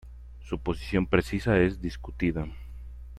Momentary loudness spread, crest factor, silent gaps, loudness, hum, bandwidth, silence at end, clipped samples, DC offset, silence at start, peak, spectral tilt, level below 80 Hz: 20 LU; 22 dB; none; -28 LUFS; none; 13.5 kHz; 0 s; under 0.1%; under 0.1%; 0.05 s; -6 dBFS; -7.5 dB/octave; -40 dBFS